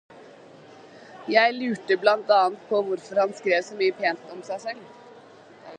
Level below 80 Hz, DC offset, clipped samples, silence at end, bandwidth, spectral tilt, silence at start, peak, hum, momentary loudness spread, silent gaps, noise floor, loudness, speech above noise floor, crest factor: -80 dBFS; under 0.1%; under 0.1%; 0 s; 9.4 kHz; -4 dB/octave; 0.15 s; -4 dBFS; none; 15 LU; none; -49 dBFS; -23 LUFS; 25 dB; 22 dB